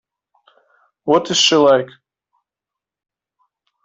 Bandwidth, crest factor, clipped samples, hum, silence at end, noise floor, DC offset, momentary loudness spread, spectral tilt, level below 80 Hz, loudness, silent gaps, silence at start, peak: 8.4 kHz; 18 dB; under 0.1%; none; 2 s; -86 dBFS; under 0.1%; 16 LU; -3 dB/octave; -62 dBFS; -14 LUFS; none; 1.05 s; -2 dBFS